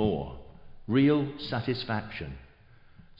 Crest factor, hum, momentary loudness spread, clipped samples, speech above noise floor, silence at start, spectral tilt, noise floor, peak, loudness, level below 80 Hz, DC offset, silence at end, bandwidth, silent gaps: 16 dB; none; 23 LU; under 0.1%; 27 dB; 0 s; -9 dB/octave; -55 dBFS; -14 dBFS; -29 LUFS; -50 dBFS; under 0.1%; 0.2 s; 5.6 kHz; none